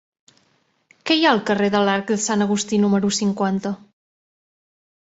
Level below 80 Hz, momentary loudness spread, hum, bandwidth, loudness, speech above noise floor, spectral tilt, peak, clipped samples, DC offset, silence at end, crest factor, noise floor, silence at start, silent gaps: -62 dBFS; 9 LU; none; 8 kHz; -19 LUFS; 45 dB; -4 dB/octave; -2 dBFS; under 0.1%; under 0.1%; 1.3 s; 20 dB; -64 dBFS; 1.05 s; none